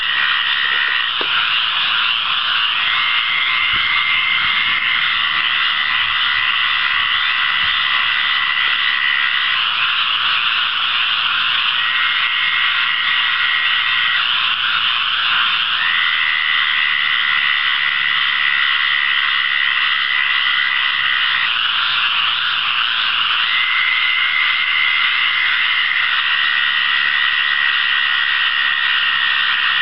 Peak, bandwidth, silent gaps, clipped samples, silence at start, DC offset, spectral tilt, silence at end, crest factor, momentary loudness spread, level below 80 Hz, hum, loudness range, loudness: -4 dBFS; 8.8 kHz; none; under 0.1%; 0 s; 0.9%; -1.5 dB/octave; 0 s; 12 dB; 1 LU; -56 dBFS; none; 1 LU; -14 LUFS